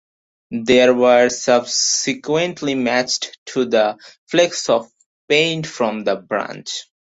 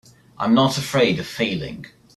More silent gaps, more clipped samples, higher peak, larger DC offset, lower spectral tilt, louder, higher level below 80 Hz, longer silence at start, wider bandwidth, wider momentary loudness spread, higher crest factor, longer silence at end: first, 3.38-3.46 s, 4.18-4.27 s, 5.06-5.28 s vs none; neither; about the same, -2 dBFS vs -4 dBFS; neither; second, -3 dB/octave vs -5 dB/octave; first, -17 LUFS vs -20 LUFS; second, -60 dBFS vs -54 dBFS; about the same, 0.5 s vs 0.4 s; second, 8 kHz vs 13.5 kHz; about the same, 11 LU vs 13 LU; about the same, 16 dB vs 18 dB; about the same, 0.2 s vs 0.3 s